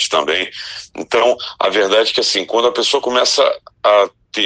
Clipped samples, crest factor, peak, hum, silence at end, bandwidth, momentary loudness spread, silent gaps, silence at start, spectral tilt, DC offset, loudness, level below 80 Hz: under 0.1%; 14 dB; 0 dBFS; none; 0 s; 9.8 kHz; 6 LU; none; 0 s; -1 dB/octave; under 0.1%; -15 LUFS; -60 dBFS